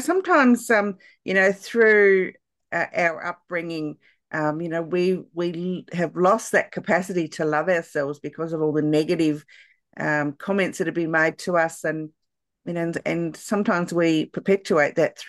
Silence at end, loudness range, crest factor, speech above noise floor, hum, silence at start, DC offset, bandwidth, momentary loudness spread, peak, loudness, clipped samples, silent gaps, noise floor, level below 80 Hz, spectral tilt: 0 s; 4 LU; 18 dB; 45 dB; none; 0 s; under 0.1%; 12.5 kHz; 12 LU; -6 dBFS; -22 LUFS; under 0.1%; none; -67 dBFS; -70 dBFS; -5.5 dB/octave